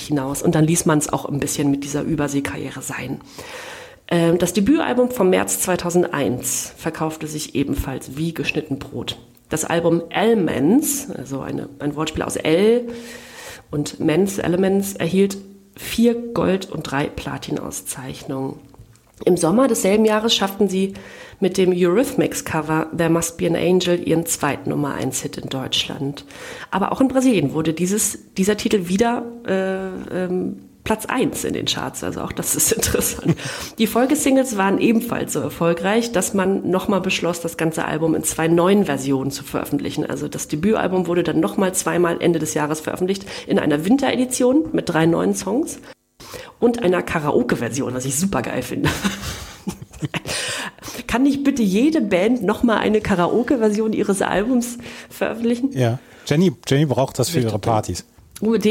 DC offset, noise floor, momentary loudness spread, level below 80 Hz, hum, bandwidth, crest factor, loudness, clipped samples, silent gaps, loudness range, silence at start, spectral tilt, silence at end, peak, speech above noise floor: under 0.1%; -47 dBFS; 12 LU; -46 dBFS; none; 17 kHz; 16 dB; -20 LUFS; under 0.1%; none; 4 LU; 0 s; -4.5 dB/octave; 0 s; -4 dBFS; 27 dB